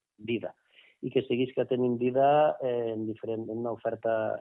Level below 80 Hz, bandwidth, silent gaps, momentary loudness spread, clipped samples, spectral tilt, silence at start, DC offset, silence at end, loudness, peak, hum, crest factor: -74 dBFS; 3.9 kHz; none; 11 LU; under 0.1%; -10 dB/octave; 0.2 s; under 0.1%; 0 s; -29 LUFS; -14 dBFS; none; 16 dB